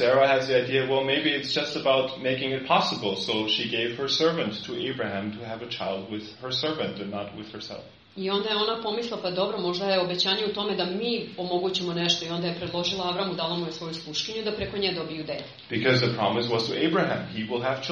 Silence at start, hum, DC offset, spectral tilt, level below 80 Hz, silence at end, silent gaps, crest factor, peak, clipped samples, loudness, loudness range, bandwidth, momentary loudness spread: 0 s; none; under 0.1%; -2.5 dB/octave; -60 dBFS; 0 s; none; 18 dB; -8 dBFS; under 0.1%; -26 LUFS; 5 LU; 8 kHz; 11 LU